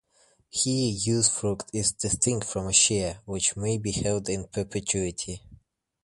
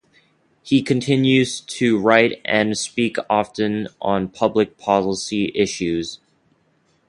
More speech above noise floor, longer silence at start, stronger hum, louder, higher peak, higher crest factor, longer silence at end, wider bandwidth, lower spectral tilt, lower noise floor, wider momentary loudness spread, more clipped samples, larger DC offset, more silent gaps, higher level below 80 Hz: second, 37 dB vs 43 dB; about the same, 0.55 s vs 0.65 s; neither; second, -25 LUFS vs -19 LUFS; second, -6 dBFS vs 0 dBFS; about the same, 22 dB vs 20 dB; second, 0.5 s vs 0.95 s; about the same, 11.5 kHz vs 11.5 kHz; second, -3.5 dB/octave vs -5 dB/octave; about the same, -64 dBFS vs -62 dBFS; about the same, 10 LU vs 8 LU; neither; neither; neither; about the same, -50 dBFS vs -54 dBFS